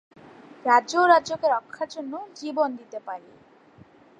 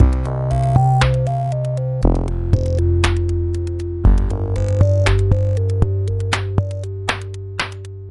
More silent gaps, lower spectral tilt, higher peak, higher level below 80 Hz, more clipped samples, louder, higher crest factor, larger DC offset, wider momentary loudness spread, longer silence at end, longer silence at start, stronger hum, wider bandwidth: neither; second, -3 dB/octave vs -6.5 dB/octave; second, -4 dBFS vs 0 dBFS; second, -74 dBFS vs -24 dBFS; neither; second, -23 LUFS vs -19 LUFS; first, 22 dB vs 16 dB; neither; first, 18 LU vs 9 LU; first, 1 s vs 0 s; first, 0.65 s vs 0 s; neither; second, 9.8 kHz vs 11 kHz